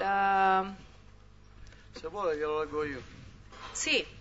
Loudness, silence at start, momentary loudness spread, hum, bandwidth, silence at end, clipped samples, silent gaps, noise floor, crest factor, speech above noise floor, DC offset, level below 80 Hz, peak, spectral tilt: -30 LUFS; 0 s; 24 LU; 50 Hz at -55 dBFS; 7.6 kHz; 0 s; under 0.1%; none; -55 dBFS; 18 dB; 22 dB; under 0.1%; -56 dBFS; -14 dBFS; -1.5 dB/octave